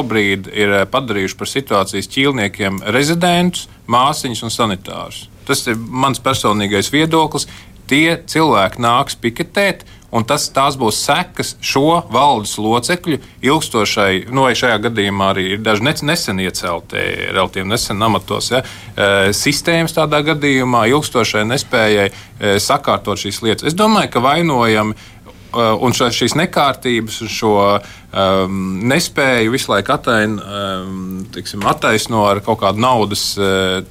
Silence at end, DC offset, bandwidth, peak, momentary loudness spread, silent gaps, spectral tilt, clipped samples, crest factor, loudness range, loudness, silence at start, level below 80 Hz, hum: 0 s; under 0.1%; 16 kHz; -2 dBFS; 7 LU; none; -4 dB/octave; under 0.1%; 14 dB; 2 LU; -15 LUFS; 0 s; -44 dBFS; none